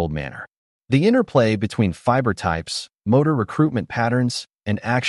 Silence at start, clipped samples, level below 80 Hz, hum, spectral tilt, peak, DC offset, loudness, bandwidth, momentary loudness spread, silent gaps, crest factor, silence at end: 0 s; under 0.1%; -46 dBFS; none; -6.5 dB/octave; -4 dBFS; under 0.1%; -20 LUFS; 11.5 kHz; 10 LU; 0.57-0.80 s; 16 dB; 0 s